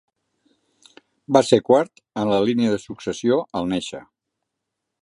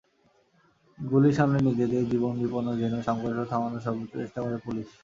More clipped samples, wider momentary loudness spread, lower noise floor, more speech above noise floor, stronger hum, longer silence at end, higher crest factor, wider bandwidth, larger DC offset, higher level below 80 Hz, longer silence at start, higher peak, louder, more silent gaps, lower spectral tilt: neither; about the same, 13 LU vs 11 LU; first, -81 dBFS vs -66 dBFS; first, 61 dB vs 39 dB; neither; first, 1 s vs 0.15 s; about the same, 22 dB vs 20 dB; first, 11.5 kHz vs 7.6 kHz; neither; about the same, -58 dBFS vs -60 dBFS; first, 1.3 s vs 1 s; first, 0 dBFS vs -8 dBFS; first, -20 LUFS vs -27 LUFS; neither; second, -5.5 dB/octave vs -8.5 dB/octave